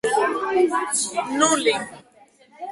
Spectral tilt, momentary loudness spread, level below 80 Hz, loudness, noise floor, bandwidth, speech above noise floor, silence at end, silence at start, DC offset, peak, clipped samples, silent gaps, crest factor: -1.5 dB/octave; 11 LU; -66 dBFS; -21 LUFS; -54 dBFS; 11.5 kHz; 33 dB; 0 s; 0.05 s; under 0.1%; -4 dBFS; under 0.1%; none; 18 dB